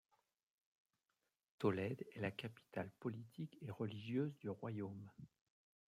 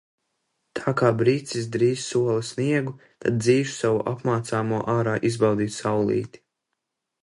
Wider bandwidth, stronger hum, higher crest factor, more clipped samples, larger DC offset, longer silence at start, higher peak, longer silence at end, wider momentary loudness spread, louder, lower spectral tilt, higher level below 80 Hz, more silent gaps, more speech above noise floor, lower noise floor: first, 15 kHz vs 11.5 kHz; neither; about the same, 22 dB vs 18 dB; neither; neither; first, 1.6 s vs 0.75 s; second, -26 dBFS vs -6 dBFS; second, 0.65 s vs 0.95 s; first, 12 LU vs 7 LU; second, -46 LUFS vs -24 LUFS; first, -8 dB/octave vs -6 dB/octave; second, -84 dBFS vs -60 dBFS; neither; second, 44 dB vs 58 dB; first, -90 dBFS vs -81 dBFS